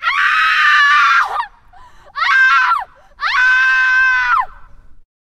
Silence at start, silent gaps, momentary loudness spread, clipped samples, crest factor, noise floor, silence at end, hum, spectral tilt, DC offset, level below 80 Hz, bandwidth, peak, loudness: 0 s; none; 13 LU; under 0.1%; 12 dB; -42 dBFS; 0.35 s; none; 2 dB/octave; under 0.1%; -46 dBFS; 13.5 kHz; -2 dBFS; -12 LUFS